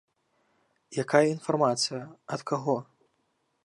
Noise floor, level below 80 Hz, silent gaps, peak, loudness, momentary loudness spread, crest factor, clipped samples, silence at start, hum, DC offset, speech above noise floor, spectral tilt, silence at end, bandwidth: -74 dBFS; -80 dBFS; none; -6 dBFS; -28 LUFS; 13 LU; 24 dB; under 0.1%; 0.9 s; none; under 0.1%; 47 dB; -4.5 dB/octave; 0.85 s; 11.5 kHz